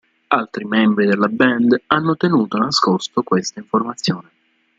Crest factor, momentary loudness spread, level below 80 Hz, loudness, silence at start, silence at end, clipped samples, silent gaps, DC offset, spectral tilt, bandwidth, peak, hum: 16 dB; 6 LU; -58 dBFS; -17 LUFS; 0.3 s; 0.6 s; under 0.1%; none; under 0.1%; -5 dB/octave; 7.8 kHz; -2 dBFS; none